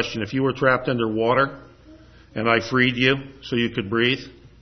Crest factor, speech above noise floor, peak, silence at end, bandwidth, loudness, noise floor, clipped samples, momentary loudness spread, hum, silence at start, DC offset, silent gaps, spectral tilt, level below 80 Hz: 20 dB; 26 dB; -4 dBFS; 0.3 s; 6.4 kHz; -21 LUFS; -48 dBFS; under 0.1%; 8 LU; none; 0 s; under 0.1%; none; -6 dB/octave; -54 dBFS